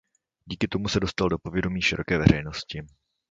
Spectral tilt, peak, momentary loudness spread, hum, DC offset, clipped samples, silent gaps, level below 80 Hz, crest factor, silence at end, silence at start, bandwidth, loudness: -5.5 dB/octave; -2 dBFS; 14 LU; none; under 0.1%; under 0.1%; none; -42 dBFS; 24 dB; 0.45 s; 0.45 s; 7.8 kHz; -25 LUFS